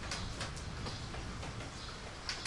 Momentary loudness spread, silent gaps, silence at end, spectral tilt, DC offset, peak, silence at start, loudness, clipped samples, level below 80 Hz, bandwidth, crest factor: 4 LU; none; 0 s; -3.5 dB/octave; under 0.1%; -22 dBFS; 0 s; -43 LUFS; under 0.1%; -50 dBFS; 11.5 kHz; 20 dB